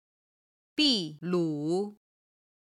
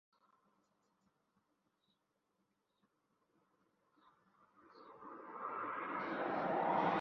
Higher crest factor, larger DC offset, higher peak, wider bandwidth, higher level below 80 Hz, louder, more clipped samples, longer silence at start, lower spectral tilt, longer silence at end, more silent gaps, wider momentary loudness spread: about the same, 20 dB vs 22 dB; neither; first, -12 dBFS vs -22 dBFS; first, 12 kHz vs 6.6 kHz; first, -72 dBFS vs -84 dBFS; first, -29 LUFS vs -40 LUFS; neither; second, 0.75 s vs 4.7 s; about the same, -5 dB/octave vs -4 dB/octave; first, 0.8 s vs 0 s; neither; second, 11 LU vs 20 LU